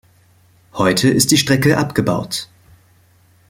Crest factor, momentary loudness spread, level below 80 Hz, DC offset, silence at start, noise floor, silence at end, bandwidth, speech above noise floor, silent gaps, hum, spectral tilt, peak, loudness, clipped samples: 18 dB; 13 LU; -48 dBFS; under 0.1%; 0.75 s; -53 dBFS; 1.05 s; 16.5 kHz; 37 dB; none; none; -4 dB/octave; 0 dBFS; -15 LUFS; under 0.1%